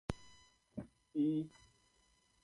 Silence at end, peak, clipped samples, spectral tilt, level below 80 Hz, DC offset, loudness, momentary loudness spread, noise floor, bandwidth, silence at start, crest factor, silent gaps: 0.95 s; -22 dBFS; under 0.1%; -7.5 dB/octave; -62 dBFS; under 0.1%; -41 LUFS; 15 LU; -74 dBFS; 11.5 kHz; 0.1 s; 22 dB; none